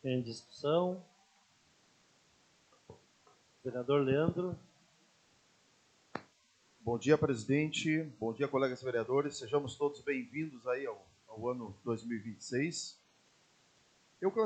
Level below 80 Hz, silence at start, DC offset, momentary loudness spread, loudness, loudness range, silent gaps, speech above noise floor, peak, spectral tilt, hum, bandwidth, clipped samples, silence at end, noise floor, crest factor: -74 dBFS; 0.05 s; under 0.1%; 15 LU; -35 LUFS; 7 LU; none; 35 dB; -14 dBFS; -5.5 dB/octave; none; 9 kHz; under 0.1%; 0 s; -70 dBFS; 22 dB